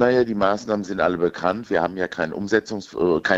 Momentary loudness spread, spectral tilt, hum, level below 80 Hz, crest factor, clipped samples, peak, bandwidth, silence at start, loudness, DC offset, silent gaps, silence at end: 6 LU; -6 dB/octave; none; -54 dBFS; 20 dB; under 0.1%; -2 dBFS; 8 kHz; 0 s; -22 LUFS; under 0.1%; none; 0 s